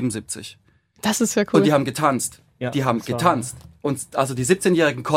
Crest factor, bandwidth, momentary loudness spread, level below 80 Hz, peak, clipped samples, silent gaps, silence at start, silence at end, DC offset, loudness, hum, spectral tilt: 20 dB; 16.5 kHz; 13 LU; -56 dBFS; -2 dBFS; under 0.1%; none; 0 s; 0 s; under 0.1%; -21 LUFS; none; -5 dB/octave